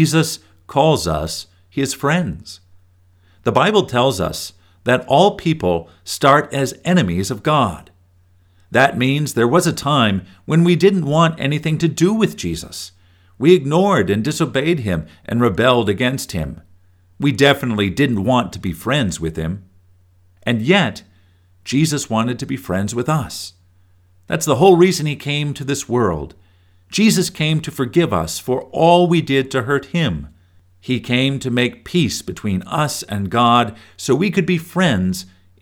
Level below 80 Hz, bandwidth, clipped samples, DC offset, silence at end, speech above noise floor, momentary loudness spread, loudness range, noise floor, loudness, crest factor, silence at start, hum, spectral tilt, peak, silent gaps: -44 dBFS; 18.5 kHz; under 0.1%; under 0.1%; 0.35 s; 37 dB; 12 LU; 4 LU; -53 dBFS; -17 LUFS; 18 dB; 0 s; none; -5.5 dB/octave; 0 dBFS; none